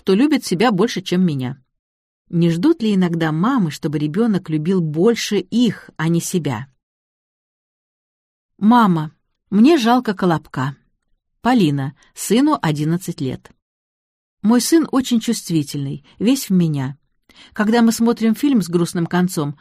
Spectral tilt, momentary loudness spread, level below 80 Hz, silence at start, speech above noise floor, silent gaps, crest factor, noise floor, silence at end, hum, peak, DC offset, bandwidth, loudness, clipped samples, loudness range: -6 dB/octave; 11 LU; -58 dBFS; 0.05 s; 49 dB; 1.79-2.25 s, 6.83-8.49 s, 13.62-14.37 s; 16 dB; -66 dBFS; 0.05 s; none; -2 dBFS; under 0.1%; 15.5 kHz; -18 LUFS; under 0.1%; 3 LU